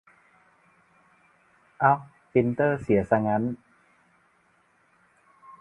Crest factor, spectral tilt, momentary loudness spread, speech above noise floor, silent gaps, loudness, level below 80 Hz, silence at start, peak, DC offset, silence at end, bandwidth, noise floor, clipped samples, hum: 24 dB; -9.5 dB/octave; 5 LU; 42 dB; none; -25 LUFS; -58 dBFS; 1.8 s; -6 dBFS; under 0.1%; 0.1 s; 10.5 kHz; -65 dBFS; under 0.1%; none